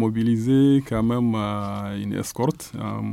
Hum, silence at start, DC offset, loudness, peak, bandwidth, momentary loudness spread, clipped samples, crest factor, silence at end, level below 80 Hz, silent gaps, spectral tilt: none; 0 s; under 0.1%; -23 LUFS; -10 dBFS; 16 kHz; 11 LU; under 0.1%; 12 dB; 0 s; -48 dBFS; none; -7 dB/octave